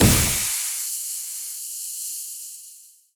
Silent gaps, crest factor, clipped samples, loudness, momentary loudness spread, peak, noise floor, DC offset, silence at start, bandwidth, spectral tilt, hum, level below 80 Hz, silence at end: none; 22 dB; under 0.1%; -24 LUFS; 16 LU; -4 dBFS; -48 dBFS; under 0.1%; 0 s; over 20 kHz; -3 dB/octave; none; -38 dBFS; 0.25 s